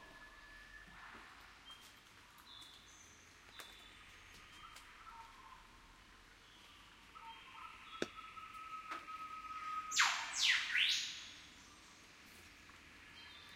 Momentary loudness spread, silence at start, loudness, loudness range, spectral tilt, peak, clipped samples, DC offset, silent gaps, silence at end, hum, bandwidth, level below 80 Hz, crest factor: 26 LU; 0 s; -38 LUFS; 20 LU; 0.5 dB/octave; -18 dBFS; under 0.1%; under 0.1%; none; 0 s; none; 16 kHz; -72 dBFS; 28 dB